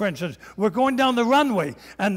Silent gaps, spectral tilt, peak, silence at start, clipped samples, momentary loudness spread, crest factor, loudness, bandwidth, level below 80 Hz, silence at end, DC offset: none; -5.5 dB/octave; -10 dBFS; 0 s; under 0.1%; 12 LU; 12 dB; -22 LUFS; 16 kHz; -58 dBFS; 0 s; under 0.1%